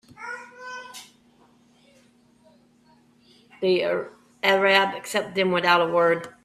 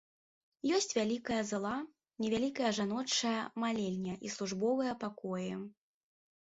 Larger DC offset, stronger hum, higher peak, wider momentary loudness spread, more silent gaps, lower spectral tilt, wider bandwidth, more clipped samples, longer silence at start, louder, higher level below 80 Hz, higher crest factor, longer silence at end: neither; neither; first, -4 dBFS vs -18 dBFS; first, 19 LU vs 8 LU; neither; about the same, -4 dB/octave vs -4 dB/octave; first, 15 kHz vs 7.6 kHz; neither; second, 0.2 s vs 0.65 s; first, -22 LUFS vs -35 LUFS; about the same, -70 dBFS vs -72 dBFS; about the same, 22 dB vs 18 dB; second, 0.15 s vs 0.75 s